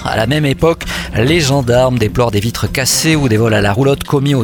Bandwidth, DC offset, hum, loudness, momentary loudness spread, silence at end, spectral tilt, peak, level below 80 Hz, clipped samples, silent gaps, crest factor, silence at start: 19 kHz; under 0.1%; none; -13 LUFS; 4 LU; 0 s; -5 dB/octave; 0 dBFS; -30 dBFS; under 0.1%; none; 12 dB; 0 s